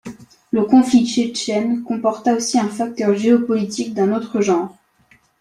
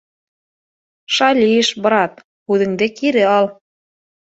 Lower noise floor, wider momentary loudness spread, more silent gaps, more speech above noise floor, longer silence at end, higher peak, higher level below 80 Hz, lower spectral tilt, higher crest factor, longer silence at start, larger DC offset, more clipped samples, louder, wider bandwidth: second, -55 dBFS vs under -90 dBFS; about the same, 8 LU vs 7 LU; second, none vs 2.24-2.46 s; second, 39 dB vs over 75 dB; about the same, 0.7 s vs 0.8 s; about the same, -2 dBFS vs -2 dBFS; about the same, -60 dBFS vs -62 dBFS; about the same, -5 dB/octave vs -4 dB/octave; about the same, 16 dB vs 16 dB; second, 0.05 s vs 1.1 s; neither; neither; second, -18 LUFS vs -15 LUFS; first, 11.5 kHz vs 8.2 kHz